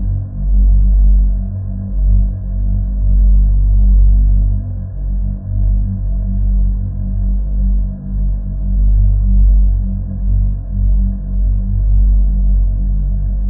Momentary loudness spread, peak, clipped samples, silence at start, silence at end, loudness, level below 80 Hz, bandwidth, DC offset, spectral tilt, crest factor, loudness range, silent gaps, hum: 8 LU; -2 dBFS; under 0.1%; 0 s; 0 s; -16 LUFS; -12 dBFS; 1.1 kHz; under 0.1%; -15 dB/octave; 10 dB; 3 LU; none; none